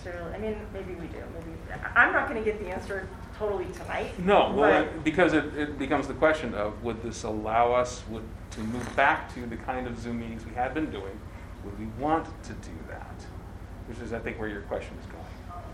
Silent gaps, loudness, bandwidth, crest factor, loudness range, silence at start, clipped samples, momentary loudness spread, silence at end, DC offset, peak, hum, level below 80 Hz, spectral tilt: none; -28 LUFS; 14.5 kHz; 24 dB; 10 LU; 0 s; under 0.1%; 19 LU; 0 s; under 0.1%; -6 dBFS; none; -44 dBFS; -5.5 dB/octave